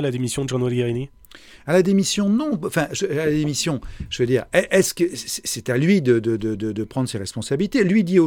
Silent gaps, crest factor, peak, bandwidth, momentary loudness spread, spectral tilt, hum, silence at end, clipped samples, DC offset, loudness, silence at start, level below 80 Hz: none; 18 dB; -2 dBFS; 18.5 kHz; 9 LU; -5 dB/octave; none; 0 s; under 0.1%; under 0.1%; -21 LUFS; 0 s; -46 dBFS